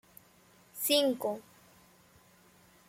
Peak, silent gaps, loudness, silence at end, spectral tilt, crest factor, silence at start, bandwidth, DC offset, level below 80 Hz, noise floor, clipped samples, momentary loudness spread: -12 dBFS; none; -30 LUFS; 1.45 s; -2 dB/octave; 24 dB; 0.75 s; 16.5 kHz; under 0.1%; -78 dBFS; -62 dBFS; under 0.1%; 17 LU